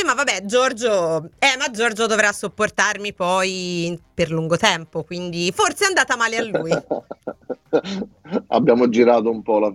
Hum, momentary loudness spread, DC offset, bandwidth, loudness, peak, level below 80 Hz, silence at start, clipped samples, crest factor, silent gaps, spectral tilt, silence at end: none; 12 LU; under 0.1%; 15 kHz; -19 LUFS; 0 dBFS; -56 dBFS; 0 s; under 0.1%; 20 dB; none; -3.5 dB/octave; 0 s